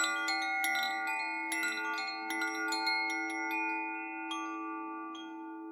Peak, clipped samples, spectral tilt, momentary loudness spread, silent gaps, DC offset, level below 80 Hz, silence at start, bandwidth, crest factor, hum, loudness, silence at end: -18 dBFS; under 0.1%; 1 dB/octave; 10 LU; none; under 0.1%; under -90 dBFS; 0 s; 19.5 kHz; 18 dB; none; -34 LUFS; 0 s